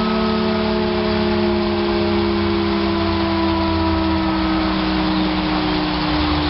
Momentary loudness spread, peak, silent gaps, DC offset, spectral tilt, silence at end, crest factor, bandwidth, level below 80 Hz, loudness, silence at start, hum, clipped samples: 1 LU; -6 dBFS; none; under 0.1%; -9.5 dB/octave; 0 s; 10 dB; 5.8 kHz; -32 dBFS; -18 LUFS; 0 s; none; under 0.1%